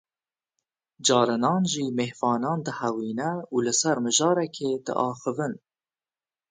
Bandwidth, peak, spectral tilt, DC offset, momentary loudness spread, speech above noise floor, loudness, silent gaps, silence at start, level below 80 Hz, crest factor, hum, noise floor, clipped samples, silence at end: 9.6 kHz; -6 dBFS; -4 dB/octave; under 0.1%; 8 LU; over 65 dB; -25 LUFS; none; 1 s; -72 dBFS; 20 dB; none; under -90 dBFS; under 0.1%; 0.95 s